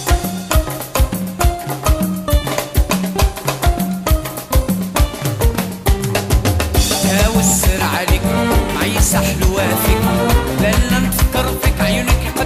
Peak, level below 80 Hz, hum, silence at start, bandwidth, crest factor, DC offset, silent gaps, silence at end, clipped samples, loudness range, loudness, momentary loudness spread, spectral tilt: -2 dBFS; -20 dBFS; none; 0 s; 15.5 kHz; 14 dB; under 0.1%; none; 0 s; under 0.1%; 3 LU; -16 LUFS; 5 LU; -4.5 dB/octave